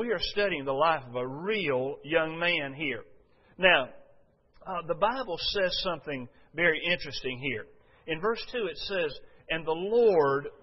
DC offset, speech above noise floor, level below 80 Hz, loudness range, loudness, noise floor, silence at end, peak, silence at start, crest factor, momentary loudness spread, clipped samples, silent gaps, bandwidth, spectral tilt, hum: under 0.1%; 33 dB; -56 dBFS; 2 LU; -29 LUFS; -62 dBFS; 0.05 s; -6 dBFS; 0 s; 22 dB; 14 LU; under 0.1%; none; 6 kHz; -5.5 dB/octave; none